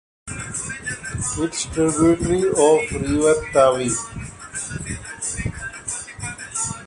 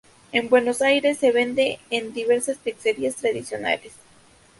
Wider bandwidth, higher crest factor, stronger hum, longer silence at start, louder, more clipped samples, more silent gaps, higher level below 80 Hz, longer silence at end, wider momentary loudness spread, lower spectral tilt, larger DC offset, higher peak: about the same, 11.5 kHz vs 11.5 kHz; about the same, 18 dB vs 18 dB; neither; about the same, 0.25 s vs 0.35 s; about the same, -21 LUFS vs -22 LUFS; neither; neither; first, -40 dBFS vs -64 dBFS; second, 0 s vs 0.7 s; first, 14 LU vs 8 LU; first, -4.5 dB/octave vs -3 dB/octave; neither; about the same, -2 dBFS vs -4 dBFS